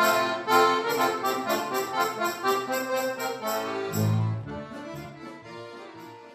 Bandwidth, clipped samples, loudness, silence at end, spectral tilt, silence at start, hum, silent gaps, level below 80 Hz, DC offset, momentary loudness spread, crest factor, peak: 15.5 kHz; under 0.1%; -26 LUFS; 0 s; -4.5 dB/octave; 0 s; none; none; -64 dBFS; under 0.1%; 19 LU; 20 dB; -8 dBFS